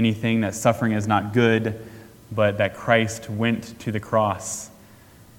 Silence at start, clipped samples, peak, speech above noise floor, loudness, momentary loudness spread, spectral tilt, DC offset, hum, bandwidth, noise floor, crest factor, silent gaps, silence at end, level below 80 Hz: 0 s; under 0.1%; -2 dBFS; 27 dB; -23 LUFS; 12 LU; -5.5 dB/octave; under 0.1%; none; 17.5 kHz; -49 dBFS; 20 dB; none; 0.7 s; -56 dBFS